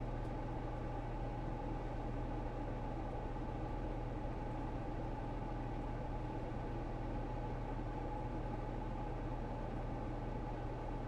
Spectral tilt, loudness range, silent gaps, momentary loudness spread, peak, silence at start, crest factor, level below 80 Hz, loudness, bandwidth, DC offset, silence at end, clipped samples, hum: -8.5 dB/octave; 0 LU; none; 1 LU; -30 dBFS; 0 s; 12 dB; -46 dBFS; -44 LUFS; 7.6 kHz; under 0.1%; 0 s; under 0.1%; none